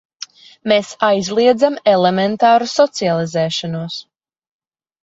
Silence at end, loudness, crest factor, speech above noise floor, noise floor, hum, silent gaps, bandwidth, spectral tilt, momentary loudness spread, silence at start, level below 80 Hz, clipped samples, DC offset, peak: 1 s; -15 LUFS; 16 dB; 22 dB; -37 dBFS; none; none; 8 kHz; -5 dB/octave; 15 LU; 0.65 s; -60 dBFS; under 0.1%; under 0.1%; 0 dBFS